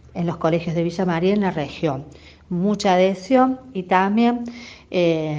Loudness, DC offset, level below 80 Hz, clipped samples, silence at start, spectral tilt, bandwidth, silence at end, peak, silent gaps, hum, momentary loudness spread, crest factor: -20 LUFS; under 0.1%; -52 dBFS; under 0.1%; 0.15 s; -6.5 dB/octave; 7.8 kHz; 0 s; -2 dBFS; none; none; 11 LU; 18 dB